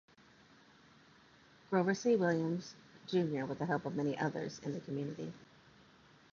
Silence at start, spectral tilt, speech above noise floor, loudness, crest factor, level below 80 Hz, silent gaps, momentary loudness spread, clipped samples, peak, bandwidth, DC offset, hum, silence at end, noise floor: 1.7 s; -6 dB/octave; 28 dB; -36 LUFS; 20 dB; -76 dBFS; none; 15 LU; under 0.1%; -18 dBFS; 7.2 kHz; under 0.1%; none; 0.9 s; -63 dBFS